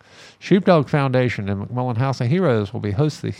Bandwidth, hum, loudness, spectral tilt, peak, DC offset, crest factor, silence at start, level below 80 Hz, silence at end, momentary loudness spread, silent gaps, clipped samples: 10 kHz; none; -20 LUFS; -7.5 dB/octave; -4 dBFS; under 0.1%; 16 dB; 0.2 s; -56 dBFS; 0 s; 9 LU; none; under 0.1%